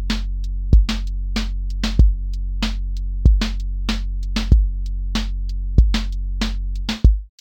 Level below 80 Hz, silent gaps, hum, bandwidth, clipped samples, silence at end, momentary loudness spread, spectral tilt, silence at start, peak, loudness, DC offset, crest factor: -18 dBFS; none; none; 8.6 kHz; under 0.1%; 0.15 s; 9 LU; -5.5 dB/octave; 0 s; 0 dBFS; -22 LUFS; under 0.1%; 18 dB